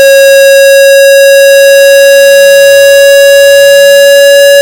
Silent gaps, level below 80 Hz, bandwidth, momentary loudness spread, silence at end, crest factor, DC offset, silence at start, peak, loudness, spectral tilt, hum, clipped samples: none; -46 dBFS; 17.5 kHz; 0 LU; 0 s; 0 dB; under 0.1%; 0 s; 0 dBFS; -1 LUFS; 1.5 dB/octave; none; 5%